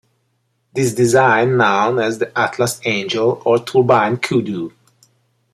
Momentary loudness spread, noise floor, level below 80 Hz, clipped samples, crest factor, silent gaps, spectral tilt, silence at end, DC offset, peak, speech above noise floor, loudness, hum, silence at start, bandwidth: 7 LU; -66 dBFS; -58 dBFS; under 0.1%; 16 dB; none; -5 dB/octave; 0.85 s; under 0.1%; -2 dBFS; 51 dB; -16 LUFS; none; 0.75 s; 14.5 kHz